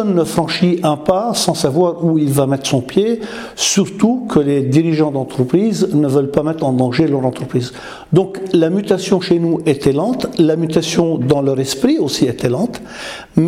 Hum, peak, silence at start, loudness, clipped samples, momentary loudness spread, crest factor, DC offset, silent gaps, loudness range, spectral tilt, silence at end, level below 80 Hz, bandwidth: none; 0 dBFS; 0 s; -15 LUFS; under 0.1%; 5 LU; 14 dB; under 0.1%; none; 1 LU; -5.5 dB/octave; 0 s; -48 dBFS; 16 kHz